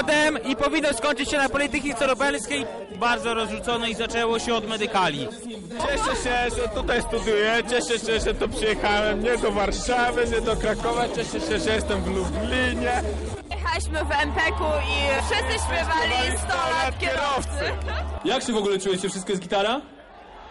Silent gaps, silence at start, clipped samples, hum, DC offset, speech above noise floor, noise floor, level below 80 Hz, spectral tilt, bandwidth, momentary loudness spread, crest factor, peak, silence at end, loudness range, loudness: none; 0 s; under 0.1%; none; under 0.1%; 20 dB; -44 dBFS; -36 dBFS; -4 dB/octave; 11.5 kHz; 6 LU; 12 dB; -12 dBFS; 0 s; 2 LU; -24 LUFS